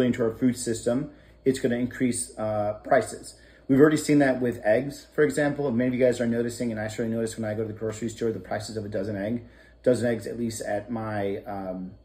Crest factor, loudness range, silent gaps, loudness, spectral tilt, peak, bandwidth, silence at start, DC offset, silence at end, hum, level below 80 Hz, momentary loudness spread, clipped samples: 22 dB; 6 LU; none; -26 LUFS; -6 dB/octave; -4 dBFS; 16 kHz; 0 s; under 0.1%; 0.1 s; none; -54 dBFS; 11 LU; under 0.1%